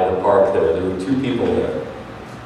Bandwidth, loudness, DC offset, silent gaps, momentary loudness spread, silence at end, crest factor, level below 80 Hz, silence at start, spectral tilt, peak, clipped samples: 11 kHz; -18 LUFS; under 0.1%; none; 16 LU; 0 s; 16 dB; -46 dBFS; 0 s; -7.5 dB/octave; -4 dBFS; under 0.1%